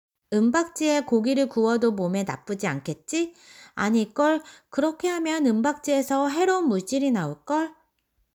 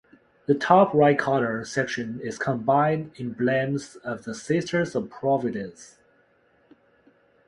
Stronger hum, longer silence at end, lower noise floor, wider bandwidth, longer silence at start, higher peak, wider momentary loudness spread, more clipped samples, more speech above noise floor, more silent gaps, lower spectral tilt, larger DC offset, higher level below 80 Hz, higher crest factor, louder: neither; second, 0.65 s vs 1.6 s; first, -72 dBFS vs -63 dBFS; first, 19 kHz vs 11 kHz; second, 0.3 s vs 0.5 s; second, -10 dBFS vs -2 dBFS; second, 7 LU vs 15 LU; neither; first, 48 dB vs 39 dB; neither; about the same, -5 dB/octave vs -6 dB/octave; neither; about the same, -66 dBFS vs -64 dBFS; second, 14 dB vs 22 dB; about the same, -25 LUFS vs -24 LUFS